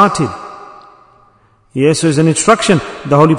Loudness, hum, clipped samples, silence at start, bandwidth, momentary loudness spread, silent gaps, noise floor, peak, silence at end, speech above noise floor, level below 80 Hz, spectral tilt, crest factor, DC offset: -12 LUFS; none; 0.8%; 0 s; 11 kHz; 18 LU; none; -51 dBFS; 0 dBFS; 0 s; 39 dB; -48 dBFS; -5 dB/octave; 14 dB; under 0.1%